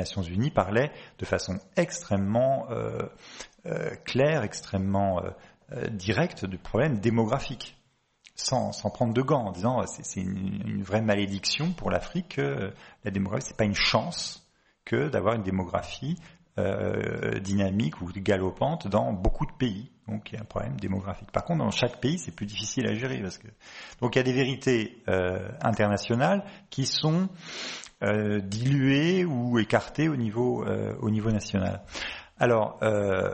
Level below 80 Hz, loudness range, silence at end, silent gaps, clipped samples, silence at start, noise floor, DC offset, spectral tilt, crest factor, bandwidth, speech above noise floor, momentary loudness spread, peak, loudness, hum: -46 dBFS; 4 LU; 0 s; none; under 0.1%; 0 s; -60 dBFS; under 0.1%; -5.5 dB/octave; 22 dB; 8.4 kHz; 33 dB; 11 LU; -6 dBFS; -28 LUFS; none